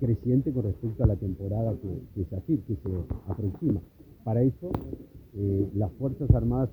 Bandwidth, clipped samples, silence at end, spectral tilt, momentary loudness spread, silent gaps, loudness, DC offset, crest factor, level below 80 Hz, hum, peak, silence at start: over 20 kHz; under 0.1%; 0 s; -12.5 dB/octave; 10 LU; none; -29 LUFS; under 0.1%; 22 dB; -38 dBFS; none; -6 dBFS; 0 s